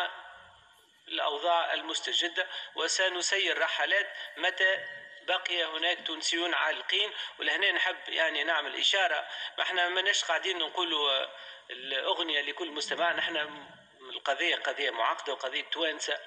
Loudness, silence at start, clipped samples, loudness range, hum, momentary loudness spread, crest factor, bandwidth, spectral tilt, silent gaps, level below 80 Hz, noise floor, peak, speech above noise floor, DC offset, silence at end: -29 LUFS; 0 s; under 0.1%; 3 LU; none; 8 LU; 18 dB; 11 kHz; 1 dB/octave; none; -86 dBFS; -61 dBFS; -14 dBFS; 30 dB; under 0.1%; 0 s